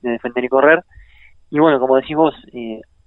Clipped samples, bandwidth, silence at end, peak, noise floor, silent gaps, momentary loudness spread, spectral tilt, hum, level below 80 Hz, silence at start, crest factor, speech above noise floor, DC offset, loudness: under 0.1%; 4.1 kHz; 0.25 s; -2 dBFS; -46 dBFS; none; 17 LU; -9 dB/octave; none; -52 dBFS; 0.05 s; 16 dB; 31 dB; under 0.1%; -15 LUFS